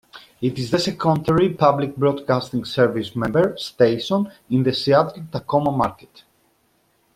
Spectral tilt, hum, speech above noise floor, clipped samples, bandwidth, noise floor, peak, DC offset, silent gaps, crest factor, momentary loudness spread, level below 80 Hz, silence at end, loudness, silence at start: -6.5 dB/octave; none; 44 dB; under 0.1%; 15.5 kHz; -63 dBFS; -2 dBFS; under 0.1%; none; 18 dB; 7 LU; -54 dBFS; 1.25 s; -20 LUFS; 0.15 s